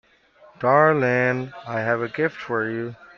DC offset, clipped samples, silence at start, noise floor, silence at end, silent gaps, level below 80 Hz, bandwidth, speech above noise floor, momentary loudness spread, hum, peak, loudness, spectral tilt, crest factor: under 0.1%; under 0.1%; 0.6 s; -53 dBFS; 0.15 s; none; -64 dBFS; 7 kHz; 32 dB; 12 LU; none; -2 dBFS; -22 LUFS; -8 dB/octave; 20 dB